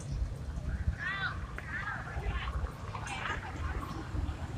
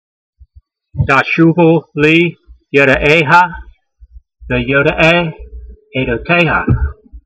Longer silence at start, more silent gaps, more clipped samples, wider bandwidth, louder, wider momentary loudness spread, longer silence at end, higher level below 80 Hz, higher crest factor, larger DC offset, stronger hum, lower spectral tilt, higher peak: second, 0 s vs 0.95 s; neither; second, under 0.1% vs 0.1%; first, 13 kHz vs 8.6 kHz; second, -38 LUFS vs -11 LUFS; second, 5 LU vs 11 LU; about the same, 0 s vs 0.05 s; second, -40 dBFS vs -30 dBFS; about the same, 18 dB vs 14 dB; neither; neither; second, -5.5 dB/octave vs -7 dB/octave; second, -18 dBFS vs 0 dBFS